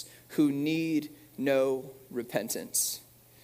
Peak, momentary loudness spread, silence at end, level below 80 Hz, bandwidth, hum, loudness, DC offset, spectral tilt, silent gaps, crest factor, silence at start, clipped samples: -14 dBFS; 12 LU; 0.4 s; -72 dBFS; 16 kHz; none; -30 LUFS; under 0.1%; -4 dB/octave; none; 16 dB; 0 s; under 0.1%